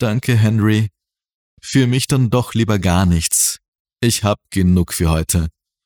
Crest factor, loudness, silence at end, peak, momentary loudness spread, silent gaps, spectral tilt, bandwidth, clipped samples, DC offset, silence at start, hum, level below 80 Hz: 14 dB; -16 LUFS; 0.35 s; -4 dBFS; 5 LU; 1.34-1.57 s, 3.68-3.73 s, 3.79-3.85 s; -5 dB/octave; 19.5 kHz; under 0.1%; under 0.1%; 0 s; none; -32 dBFS